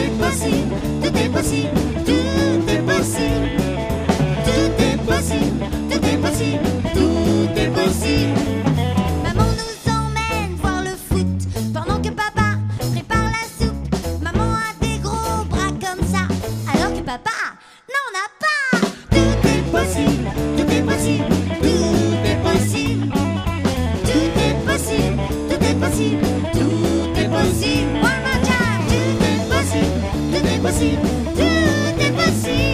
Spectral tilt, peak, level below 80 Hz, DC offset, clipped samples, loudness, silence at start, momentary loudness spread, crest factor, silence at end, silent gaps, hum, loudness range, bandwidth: -5.5 dB/octave; -2 dBFS; -30 dBFS; under 0.1%; under 0.1%; -19 LUFS; 0 s; 5 LU; 16 dB; 0 s; none; none; 3 LU; 15.5 kHz